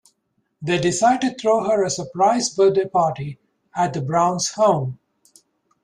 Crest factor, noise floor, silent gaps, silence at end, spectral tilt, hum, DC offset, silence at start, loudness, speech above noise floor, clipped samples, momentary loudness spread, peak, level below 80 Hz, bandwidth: 16 dB; -71 dBFS; none; 0.9 s; -4.5 dB/octave; none; under 0.1%; 0.6 s; -19 LUFS; 52 dB; under 0.1%; 11 LU; -4 dBFS; -60 dBFS; 11 kHz